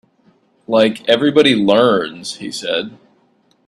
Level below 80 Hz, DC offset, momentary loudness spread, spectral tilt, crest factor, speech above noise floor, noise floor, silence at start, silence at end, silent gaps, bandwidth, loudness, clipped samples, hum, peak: -58 dBFS; under 0.1%; 13 LU; -4.5 dB/octave; 16 dB; 43 dB; -57 dBFS; 0.7 s; 0.75 s; none; 12.5 kHz; -15 LUFS; under 0.1%; none; 0 dBFS